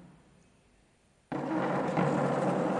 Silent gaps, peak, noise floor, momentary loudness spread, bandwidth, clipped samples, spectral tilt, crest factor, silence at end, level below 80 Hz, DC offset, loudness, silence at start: none; -16 dBFS; -66 dBFS; 8 LU; 11 kHz; under 0.1%; -7.5 dB/octave; 16 dB; 0 s; -68 dBFS; under 0.1%; -31 LUFS; 0 s